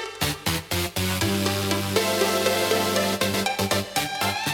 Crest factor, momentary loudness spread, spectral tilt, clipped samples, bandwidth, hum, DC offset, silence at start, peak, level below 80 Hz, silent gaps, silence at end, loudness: 18 dB; 4 LU; -3.5 dB/octave; under 0.1%; 18 kHz; none; under 0.1%; 0 s; -6 dBFS; -52 dBFS; none; 0 s; -23 LUFS